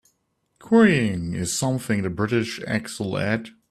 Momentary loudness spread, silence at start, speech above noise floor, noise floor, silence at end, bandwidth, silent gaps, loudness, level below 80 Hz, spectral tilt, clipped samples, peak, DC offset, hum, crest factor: 10 LU; 0.65 s; 49 dB; -71 dBFS; 0.2 s; 14 kHz; none; -23 LUFS; -54 dBFS; -5.5 dB/octave; under 0.1%; -6 dBFS; under 0.1%; none; 18 dB